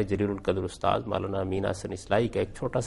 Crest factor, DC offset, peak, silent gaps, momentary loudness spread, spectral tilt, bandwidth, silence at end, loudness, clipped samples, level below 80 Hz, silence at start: 20 dB; under 0.1%; -8 dBFS; none; 4 LU; -6.5 dB/octave; 11.5 kHz; 0 s; -29 LUFS; under 0.1%; -50 dBFS; 0 s